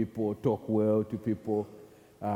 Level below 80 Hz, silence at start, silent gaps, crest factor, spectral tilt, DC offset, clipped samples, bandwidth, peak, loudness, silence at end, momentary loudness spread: -66 dBFS; 0 s; none; 16 dB; -9.5 dB/octave; under 0.1%; under 0.1%; 15 kHz; -14 dBFS; -31 LUFS; 0 s; 8 LU